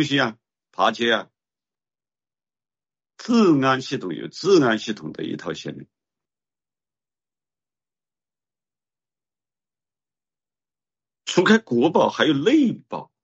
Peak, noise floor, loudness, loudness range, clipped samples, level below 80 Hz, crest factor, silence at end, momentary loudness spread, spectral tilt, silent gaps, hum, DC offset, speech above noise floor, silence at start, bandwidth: -4 dBFS; under -90 dBFS; -20 LUFS; 14 LU; under 0.1%; -68 dBFS; 20 dB; 0.2 s; 15 LU; -5 dB/octave; none; none; under 0.1%; over 70 dB; 0 s; 8 kHz